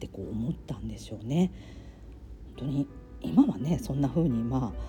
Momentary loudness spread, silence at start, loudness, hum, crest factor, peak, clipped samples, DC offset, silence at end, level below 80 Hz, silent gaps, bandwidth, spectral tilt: 23 LU; 0 s; -30 LUFS; none; 20 dB; -10 dBFS; under 0.1%; under 0.1%; 0 s; -46 dBFS; none; 17.5 kHz; -8 dB/octave